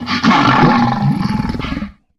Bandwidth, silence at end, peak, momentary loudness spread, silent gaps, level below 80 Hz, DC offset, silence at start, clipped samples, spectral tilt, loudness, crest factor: 12 kHz; 0.25 s; 0 dBFS; 12 LU; none; -34 dBFS; under 0.1%; 0 s; under 0.1%; -6.5 dB/octave; -13 LUFS; 14 dB